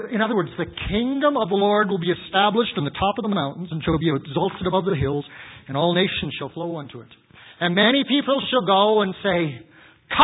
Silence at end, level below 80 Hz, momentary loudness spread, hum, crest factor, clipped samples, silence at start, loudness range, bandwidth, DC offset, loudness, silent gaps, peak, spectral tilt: 0 s; -46 dBFS; 12 LU; none; 20 dB; under 0.1%; 0 s; 3 LU; 4 kHz; under 0.1%; -21 LUFS; none; -2 dBFS; -10.5 dB/octave